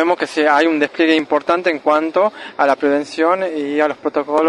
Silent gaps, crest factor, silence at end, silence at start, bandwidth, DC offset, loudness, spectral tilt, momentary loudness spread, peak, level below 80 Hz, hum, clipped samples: none; 16 dB; 0 s; 0 s; 11 kHz; under 0.1%; -16 LUFS; -4.5 dB/octave; 4 LU; 0 dBFS; -64 dBFS; none; under 0.1%